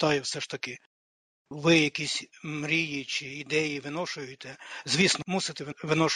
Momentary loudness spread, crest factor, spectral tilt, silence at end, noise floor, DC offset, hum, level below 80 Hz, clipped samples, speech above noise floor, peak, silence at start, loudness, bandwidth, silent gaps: 16 LU; 22 dB; -3.5 dB/octave; 0 s; under -90 dBFS; under 0.1%; none; -68 dBFS; under 0.1%; over 61 dB; -8 dBFS; 0 s; -28 LUFS; 11.5 kHz; 0.86-1.45 s